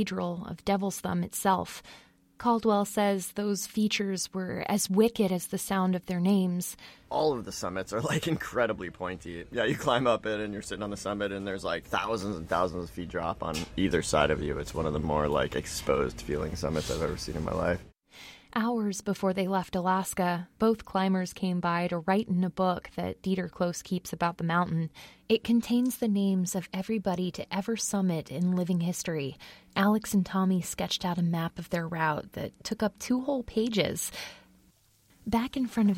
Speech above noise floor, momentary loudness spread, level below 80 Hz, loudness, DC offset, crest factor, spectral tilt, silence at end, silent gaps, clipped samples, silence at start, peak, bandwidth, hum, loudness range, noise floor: 35 dB; 9 LU; -50 dBFS; -30 LUFS; under 0.1%; 20 dB; -5 dB/octave; 0 s; none; under 0.1%; 0 s; -8 dBFS; 16.5 kHz; none; 3 LU; -64 dBFS